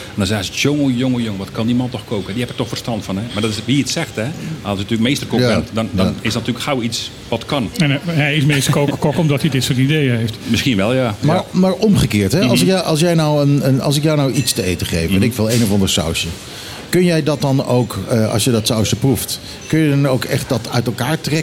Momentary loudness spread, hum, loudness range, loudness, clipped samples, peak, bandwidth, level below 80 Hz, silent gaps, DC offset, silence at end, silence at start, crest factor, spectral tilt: 8 LU; none; 5 LU; -16 LUFS; under 0.1%; -2 dBFS; 17 kHz; -40 dBFS; none; under 0.1%; 0 s; 0 s; 14 dB; -5 dB/octave